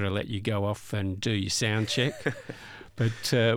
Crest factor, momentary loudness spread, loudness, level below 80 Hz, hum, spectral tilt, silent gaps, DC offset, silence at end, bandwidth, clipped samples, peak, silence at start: 16 dB; 14 LU; -28 LUFS; -58 dBFS; none; -4.5 dB/octave; none; under 0.1%; 0 s; 17 kHz; under 0.1%; -12 dBFS; 0 s